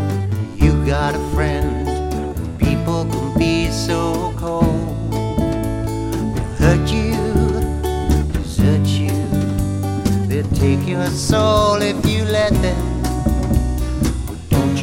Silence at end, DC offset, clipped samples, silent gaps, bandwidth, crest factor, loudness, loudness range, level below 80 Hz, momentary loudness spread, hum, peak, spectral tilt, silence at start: 0 s; under 0.1%; under 0.1%; none; 16.5 kHz; 16 dB; -18 LUFS; 2 LU; -24 dBFS; 6 LU; none; 0 dBFS; -6.5 dB/octave; 0 s